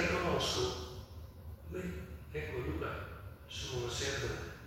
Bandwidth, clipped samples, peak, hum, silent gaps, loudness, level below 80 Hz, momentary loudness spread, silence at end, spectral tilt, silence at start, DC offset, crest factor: 16.5 kHz; under 0.1%; -20 dBFS; none; none; -38 LUFS; -52 dBFS; 17 LU; 0 s; -4 dB/octave; 0 s; under 0.1%; 18 dB